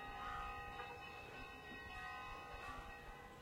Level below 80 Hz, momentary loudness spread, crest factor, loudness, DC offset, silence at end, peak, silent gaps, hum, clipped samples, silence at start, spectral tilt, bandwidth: -62 dBFS; 5 LU; 14 dB; -51 LUFS; under 0.1%; 0 s; -36 dBFS; none; none; under 0.1%; 0 s; -4 dB/octave; 16 kHz